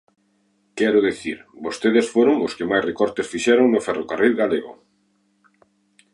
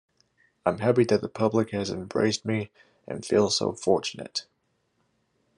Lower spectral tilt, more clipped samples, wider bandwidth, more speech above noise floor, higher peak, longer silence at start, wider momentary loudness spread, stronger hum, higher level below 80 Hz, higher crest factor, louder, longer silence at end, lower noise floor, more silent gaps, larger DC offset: about the same, -4.5 dB/octave vs -5 dB/octave; neither; about the same, 11.5 kHz vs 11 kHz; about the same, 45 dB vs 47 dB; first, -4 dBFS vs -8 dBFS; about the same, 0.75 s vs 0.65 s; first, 14 LU vs 11 LU; neither; first, -60 dBFS vs -70 dBFS; about the same, 18 dB vs 20 dB; first, -20 LUFS vs -26 LUFS; first, 1.4 s vs 1.15 s; second, -65 dBFS vs -73 dBFS; neither; neither